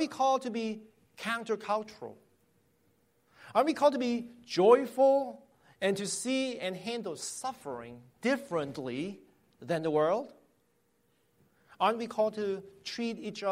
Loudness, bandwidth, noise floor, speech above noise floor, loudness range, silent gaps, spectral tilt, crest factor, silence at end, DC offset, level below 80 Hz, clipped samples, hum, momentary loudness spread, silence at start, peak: -31 LUFS; 16 kHz; -73 dBFS; 42 dB; 7 LU; none; -4.5 dB/octave; 22 dB; 0 s; under 0.1%; -76 dBFS; under 0.1%; none; 16 LU; 0 s; -10 dBFS